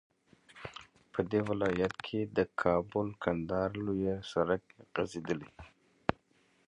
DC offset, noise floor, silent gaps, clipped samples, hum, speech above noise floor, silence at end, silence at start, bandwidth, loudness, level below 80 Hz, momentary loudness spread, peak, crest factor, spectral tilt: under 0.1%; -70 dBFS; none; under 0.1%; none; 37 dB; 0.55 s; 0.55 s; 10.5 kHz; -34 LUFS; -58 dBFS; 13 LU; -6 dBFS; 28 dB; -7 dB/octave